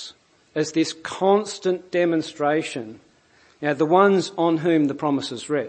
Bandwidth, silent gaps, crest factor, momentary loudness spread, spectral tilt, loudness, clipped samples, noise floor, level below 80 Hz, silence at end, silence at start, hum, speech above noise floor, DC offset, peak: 8.8 kHz; none; 20 dB; 12 LU; -5.5 dB/octave; -22 LUFS; under 0.1%; -57 dBFS; -70 dBFS; 0 s; 0 s; none; 36 dB; under 0.1%; -2 dBFS